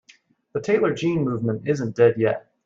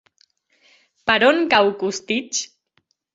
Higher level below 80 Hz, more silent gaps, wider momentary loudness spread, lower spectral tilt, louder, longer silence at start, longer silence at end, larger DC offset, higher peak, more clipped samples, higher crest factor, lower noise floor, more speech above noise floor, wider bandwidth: about the same, -62 dBFS vs -60 dBFS; neither; second, 7 LU vs 11 LU; first, -7.5 dB/octave vs -2.5 dB/octave; second, -22 LUFS vs -19 LUFS; second, 0.55 s vs 1.05 s; second, 0.25 s vs 0.7 s; neither; second, -6 dBFS vs -2 dBFS; neither; about the same, 16 dB vs 20 dB; second, -56 dBFS vs -67 dBFS; second, 35 dB vs 49 dB; about the same, 7.6 kHz vs 8 kHz